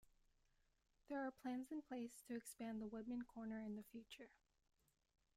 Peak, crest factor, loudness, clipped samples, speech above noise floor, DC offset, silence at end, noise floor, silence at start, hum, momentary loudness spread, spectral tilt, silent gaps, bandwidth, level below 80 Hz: -38 dBFS; 14 dB; -52 LUFS; under 0.1%; 31 dB; under 0.1%; 1.1 s; -82 dBFS; 1.1 s; none; 10 LU; -5 dB/octave; none; 15.5 kHz; -80 dBFS